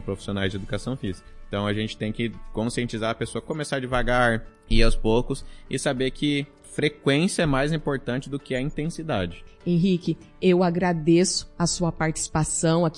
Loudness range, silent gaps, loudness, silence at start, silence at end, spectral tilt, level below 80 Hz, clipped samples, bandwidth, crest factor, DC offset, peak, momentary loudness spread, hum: 5 LU; none; -25 LUFS; 0 s; 0 s; -5 dB/octave; -34 dBFS; under 0.1%; 11.5 kHz; 20 dB; under 0.1%; -4 dBFS; 10 LU; none